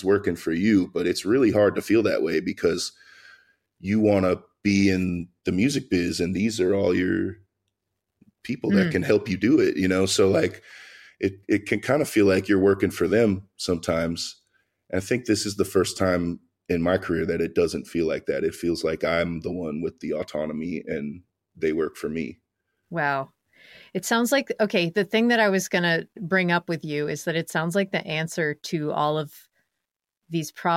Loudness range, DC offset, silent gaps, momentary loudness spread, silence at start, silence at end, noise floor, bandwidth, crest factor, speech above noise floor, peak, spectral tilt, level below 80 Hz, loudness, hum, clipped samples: 6 LU; under 0.1%; none; 11 LU; 0 s; 0 s; -84 dBFS; 16.5 kHz; 18 dB; 61 dB; -6 dBFS; -5.5 dB/octave; -56 dBFS; -24 LUFS; none; under 0.1%